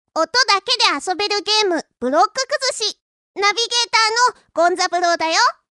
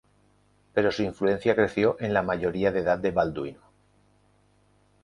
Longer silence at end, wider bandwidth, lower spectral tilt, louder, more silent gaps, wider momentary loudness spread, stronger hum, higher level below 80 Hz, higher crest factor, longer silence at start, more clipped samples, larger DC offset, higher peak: second, 0.2 s vs 1.5 s; about the same, 12 kHz vs 11 kHz; second, 0.5 dB/octave vs -7 dB/octave; first, -17 LUFS vs -26 LUFS; first, 3.02-3.34 s vs none; about the same, 6 LU vs 6 LU; second, none vs 50 Hz at -50 dBFS; second, -66 dBFS vs -54 dBFS; about the same, 18 dB vs 20 dB; second, 0.15 s vs 0.75 s; neither; neither; first, 0 dBFS vs -8 dBFS